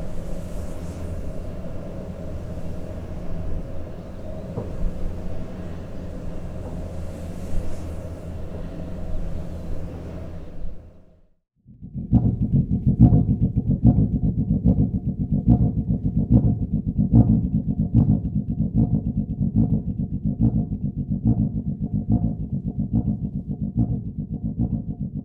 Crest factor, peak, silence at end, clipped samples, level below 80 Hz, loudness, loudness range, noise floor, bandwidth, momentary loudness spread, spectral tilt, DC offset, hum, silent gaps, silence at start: 22 dB; -2 dBFS; 0 s; under 0.1%; -30 dBFS; -24 LUFS; 14 LU; -52 dBFS; 8 kHz; 16 LU; -10.5 dB/octave; under 0.1%; none; none; 0 s